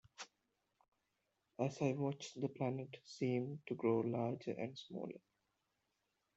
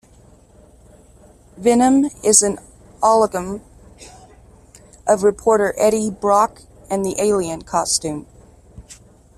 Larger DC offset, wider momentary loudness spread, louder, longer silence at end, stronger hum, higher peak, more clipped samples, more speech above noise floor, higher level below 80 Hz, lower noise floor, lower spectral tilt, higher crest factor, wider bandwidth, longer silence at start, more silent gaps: neither; first, 17 LU vs 13 LU; second, -42 LUFS vs -17 LUFS; first, 1.2 s vs 0.45 s; neither; second, -24 dBFS vs 0 dBFS; neither; first, 45 dB vs 32 dB; second, -84 dBFS vs -48 dBFS; first, -86 dBFS vs -48 dBFS; first, -7 dB/octave vs -3.5 dB/octave; about the same, 20 dB vs 20 dB; second, 8.2 kHz vs 15 kHz; second, 0.2 s vs 1.55 s; first, 0.88-0.92 s vs none